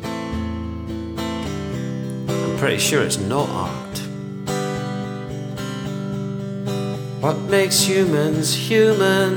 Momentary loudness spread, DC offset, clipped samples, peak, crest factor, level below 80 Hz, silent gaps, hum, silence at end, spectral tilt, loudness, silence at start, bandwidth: 13 LU; under 0.1%; under 0.1%; -4 dBFS; 18 dB; -44 dBFS; none; none; 0 s; -4.5 dB/octave; -21 LUFS; 0 s; over 20 kHz